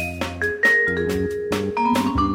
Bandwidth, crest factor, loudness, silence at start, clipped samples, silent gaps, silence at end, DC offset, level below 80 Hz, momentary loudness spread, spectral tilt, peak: 16.5 kHz; 14 dB; -20 LUFS; 0 s; under 0.1%; none; 0 s; under 0.1%; -38 dBFS; 8 LU; -5.5 dB/octave; -6 dBFS